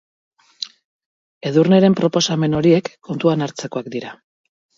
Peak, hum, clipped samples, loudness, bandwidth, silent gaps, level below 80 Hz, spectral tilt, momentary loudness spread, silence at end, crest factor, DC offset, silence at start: -2 dBFS; none; under 0.1%; -17 LUFS; 7.8 kHz; 0.85-1.00 s, 1.06-1.41 s; -56 dBFS; -6 dB/octave; 18 LU; 0.65 s; 18 dB; under 0.1%; 0.6 s